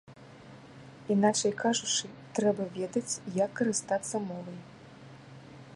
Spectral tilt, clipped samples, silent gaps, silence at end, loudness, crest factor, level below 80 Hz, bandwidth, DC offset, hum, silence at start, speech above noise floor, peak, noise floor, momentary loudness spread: -3.5 dB/octave; under 0.1%; none; 0 s; -30 LUFS; 20 dB; -72 dBFS; 11.5 kHz; under 0.1%; none; 0.1 s; 21 dB; -12 dBFS; -51 dBFS; 24 LU